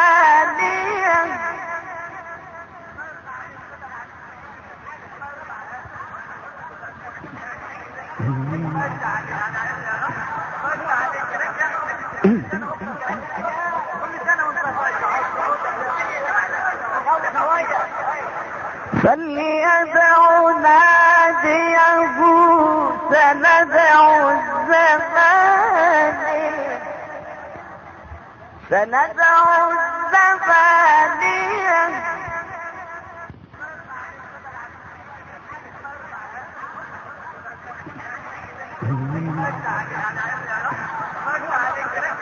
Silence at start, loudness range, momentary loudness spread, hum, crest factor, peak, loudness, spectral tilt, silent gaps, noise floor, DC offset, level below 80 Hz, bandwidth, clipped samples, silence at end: 0 s; 22 LU; 23 LU; none; 18 dB; -2 dBFS; -17 LUFS; -5.5 dB/octave; none; -40 dBFS; under 0.1%; -54 dBFS; 7.4 kHz; under 0.1%; 0 s